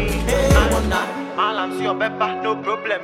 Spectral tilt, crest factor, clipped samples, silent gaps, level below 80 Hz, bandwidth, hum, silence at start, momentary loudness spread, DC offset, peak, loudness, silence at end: -5 dB/octave; 18 dB; under 0.1%; none; -26 dBFS; 16 kHz; none; 0 s; 7 LU; under 0.1%; -2 dBFS; -20 LUFS; 0 s